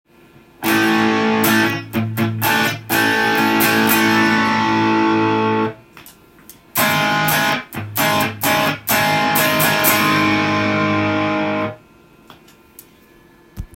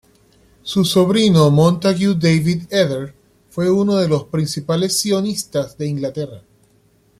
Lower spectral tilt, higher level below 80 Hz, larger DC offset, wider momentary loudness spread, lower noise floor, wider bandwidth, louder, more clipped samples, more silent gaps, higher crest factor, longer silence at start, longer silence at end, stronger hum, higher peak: second, -4 dB/octave vs -5.5 dB/octave; about the same, -50 dBFS vs -52 dBFS; neither; second, 7 LU vs 12 LU; second, -48 dBFS vs -56 dBFS; first, 17 kHz vs 15 kHz; about the same, -16 LUFS vs -17 LUFS; neither; neither; about the same, 18 dB vs 16 dB; about the same, 0.6 s vs 0.65 s; second, 0.1 s vs 0.8 s; neither; about the same, 0 dBFS vs -2 dBFS